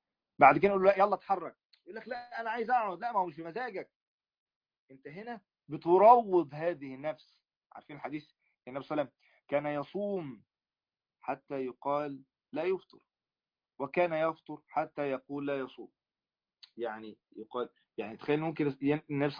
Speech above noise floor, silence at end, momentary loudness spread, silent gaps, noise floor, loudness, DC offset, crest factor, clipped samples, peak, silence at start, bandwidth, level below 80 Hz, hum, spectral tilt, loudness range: over 59 dB; 0 s; 21 LU; 1.65-1.70 s, 3.96-4.19 s, 4.38-4.46 s, 4.56-4.61 s, 4.79-4.88 s, 7.57-7.61 s; under -90 dBFS; -31 LUFS; under 0.1%; 24 dB; under 0.1%; -8 dBFS; 0.4 s; 5.2 kHz; -74 dBFS; none; -5 dB/octave; 10 LU